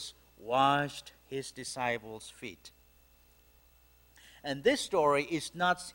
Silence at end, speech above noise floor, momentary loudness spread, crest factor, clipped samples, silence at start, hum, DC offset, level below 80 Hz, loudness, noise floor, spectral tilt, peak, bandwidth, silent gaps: 0.05 s; 31 dB; 18 LU; 20 dB; under 0.1%; 0 s; none; under 0.1%; -66 dBFS; -31 LUFS; -63 dBFS; -4 dB/octave; -14 dBFS; 16.5 kHz; none